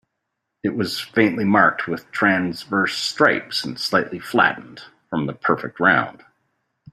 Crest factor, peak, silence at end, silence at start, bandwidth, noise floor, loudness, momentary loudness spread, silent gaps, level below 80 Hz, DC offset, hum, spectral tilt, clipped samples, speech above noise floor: 20 dB; -2 dBFS; 0.8 s; 0.65 s; 15.5 kHz; -78 dBFS; -20 LUFS; 10 LU; none; -62 dBFS; under 0.1%; none; -5 dB/octave; under 0.1%; 58 dB